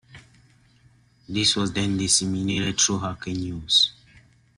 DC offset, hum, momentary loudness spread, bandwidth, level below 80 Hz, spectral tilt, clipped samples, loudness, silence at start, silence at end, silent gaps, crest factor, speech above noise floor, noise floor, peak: under 0.1%; none; 12 LU; 12.5 kHz; -54 dBFS; -2.5 dB/octave; under 0.1%; -22 LUFS; 0.15 s; 0.65 s; none; 18 dB; 34 dB; -58 dBFS; -6 dBFS